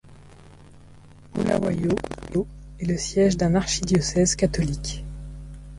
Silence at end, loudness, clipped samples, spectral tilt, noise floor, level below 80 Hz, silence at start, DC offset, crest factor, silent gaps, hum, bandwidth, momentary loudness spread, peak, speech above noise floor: 0 s; -24 LUFS; under 0.1%; -5 dB/octave; -47 dBFS; -38 dBFS; 0.05 s; under 0.1%; 16 dB; none; none; 11.5 kHz; 15 LU; -8 dBFS; 25 dB